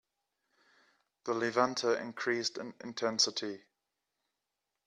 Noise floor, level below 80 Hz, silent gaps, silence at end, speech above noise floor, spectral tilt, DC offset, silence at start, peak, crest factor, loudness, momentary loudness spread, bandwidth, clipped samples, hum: -87 dBFS; -82 dBFS; none; 1.3 s; 54 dB; -2 dB/octave; under 0.1%; 1.25 s; -14 dBFS; 24 dB; -33 LUFS; 14 LU; 12 kHz; under 0.1%; 50 Hz at -85 dBFS